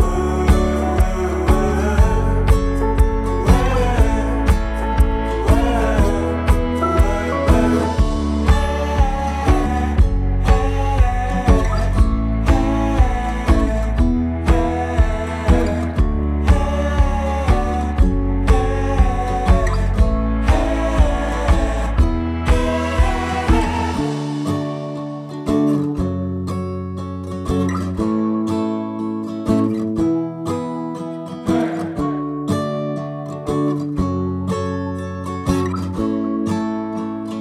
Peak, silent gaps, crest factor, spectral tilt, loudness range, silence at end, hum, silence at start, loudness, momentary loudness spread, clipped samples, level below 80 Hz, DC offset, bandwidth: -2 dBFS; none; 16 dB; -7 dB/octave; 5 LU; 0 s; none; 0 s; -19 LUFS; 7 LU; under 0.1%; -20 dBFS; under 0.1%; 13 kHz